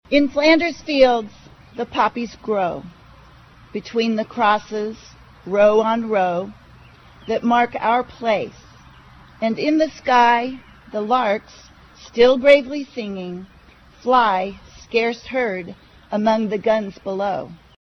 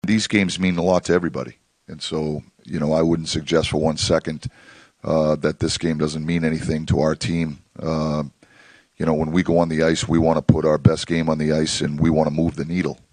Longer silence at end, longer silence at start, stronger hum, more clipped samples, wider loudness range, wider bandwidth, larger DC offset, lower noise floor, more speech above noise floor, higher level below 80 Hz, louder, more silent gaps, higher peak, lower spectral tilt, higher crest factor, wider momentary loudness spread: about the same, 0.3 s vs 0.2 s; about the same, 0.1 s vs 0.05 s; neither; neither; about the same, 4 LU vs 4 LU; second, 7.2 kHz vs 10 kHz; neither; about the same, -48 dBFS vs -51 dBFS; about the same, 29 dB vs 31 dB; second, -50 dBFS vs -42 dBFS; about the same, -19 LUFS vs -21 LUFS; neither; about the same, -2 dBFS vs 0 dBFS; about the same, -5.5 dB/octave vs -5.5 dB/octave; about the same, 18 dB vs 20 dB; first, 16 LU vs 10 LU